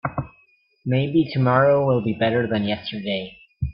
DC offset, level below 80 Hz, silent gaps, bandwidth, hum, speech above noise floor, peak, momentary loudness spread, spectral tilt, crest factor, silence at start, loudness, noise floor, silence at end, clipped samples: under 0.1%; -46 dBFS; none; 5.4 kHz; none; 40 dB; -4 dBFS; 15 LU; -11 dB/octave; 18 dB; 0.05 s; -21 LUFS; -60 dBFS; 0 s; under 0.1%